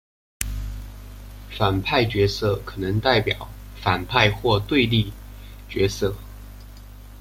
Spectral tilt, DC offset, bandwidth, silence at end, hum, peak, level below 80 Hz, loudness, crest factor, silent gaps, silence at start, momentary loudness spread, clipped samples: -5.5 dB/octave; under 0.1%; 16.5 kHz; 0 s; 50 Hz at -35 dBFS; -2 dBFS; -38 dBFS; -22 LUFS; 22 dB; none; 0.4 s; 23 LU; under 0.1%